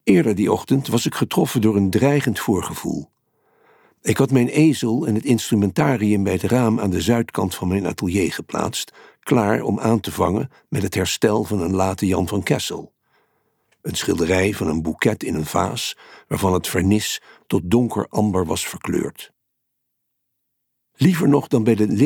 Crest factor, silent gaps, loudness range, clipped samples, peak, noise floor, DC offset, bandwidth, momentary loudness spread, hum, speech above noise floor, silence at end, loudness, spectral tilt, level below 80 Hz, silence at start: 16 dB; none; 4 LU; under 0.1%; -4 dBFS; -75 dBFS; under 0.1%; 19 kHz; 9 LU; none; 56 dB; 0 s; -20 LUFS; -5.5 dB/octave; -48 dBFS; 0.05 s